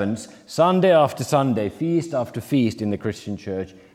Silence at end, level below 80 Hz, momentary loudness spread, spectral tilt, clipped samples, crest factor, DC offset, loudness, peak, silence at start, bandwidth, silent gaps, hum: 0.25 s; -62 dBFS; 14 LU; -6.5 dB/octave; under 0.1%; 16 dB; under 0.1%; -22 LUFS; -4 dBFS; 0 s; 16 kHz; none; none